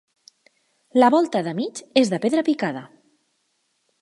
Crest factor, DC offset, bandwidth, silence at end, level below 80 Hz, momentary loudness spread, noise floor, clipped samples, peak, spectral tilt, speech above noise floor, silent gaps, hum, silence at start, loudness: 22 dB; under 0.1%; 11.5 kHz; 1.15 s; -74 dBFS; 11 LU; -70 dBFS; under 0.1%; 0 dBFS; -5 dB/octave; 50 dB; none; none; 0.95 s; -21 LUFS